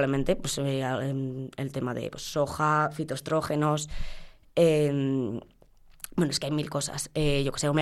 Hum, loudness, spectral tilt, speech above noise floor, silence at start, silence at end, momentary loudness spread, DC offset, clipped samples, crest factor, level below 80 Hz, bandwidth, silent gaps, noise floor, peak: none; -28 LUFS; -5 dB/octave; 28 dB; 0 s; 0 s; 10 LU; under 0.1%; under 0.1%; 16 dB; -44 dBFS; 15 kHz; none; -55 dBFS; -12 dBFS